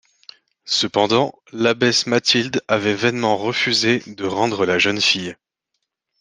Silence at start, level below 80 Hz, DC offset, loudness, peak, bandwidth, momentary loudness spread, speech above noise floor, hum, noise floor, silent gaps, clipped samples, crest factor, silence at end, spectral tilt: 0.65 s; -62 dBFS; under 0.1%; -18 LUFS; 0 dBFS; 10.5 kHz; 6 LU; 58 dB; none; -77 dBFS; none; under 0.1%; 20 dB; 0.85 s; -3.5 dB/octave